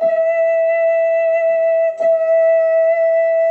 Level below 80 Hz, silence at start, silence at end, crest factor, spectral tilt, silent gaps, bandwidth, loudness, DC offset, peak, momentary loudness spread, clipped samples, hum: -72 dBFS; 0 s; 0 s; 6 dB; -4 dB/octave; none; 3.5 kHz; -15 LUFS; under 0.1%; -8 dBFS; 2 LU; under 0.1%; none